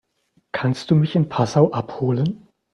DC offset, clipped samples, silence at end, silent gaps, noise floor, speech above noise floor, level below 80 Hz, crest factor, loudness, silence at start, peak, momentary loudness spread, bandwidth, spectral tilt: under 0.1%; under 0.1%; 0.35 s; none; -65 dBFS; 46 dB; -56 dBFS; 20 dB; -20 LUFS; 0.55 s; -2 dBFS; 8 LU; 9 kHz; -7.5 dB/octave